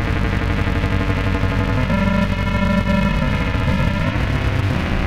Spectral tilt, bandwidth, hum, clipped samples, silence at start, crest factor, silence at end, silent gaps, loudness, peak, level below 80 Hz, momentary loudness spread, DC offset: -7 dB/octave; 13.5 kHz; none; under 0.1%; 0 s; 12 dB; 0 s; none; -19 LUFS; -4 dBFS; -24 dBFS; 2 LU; 2%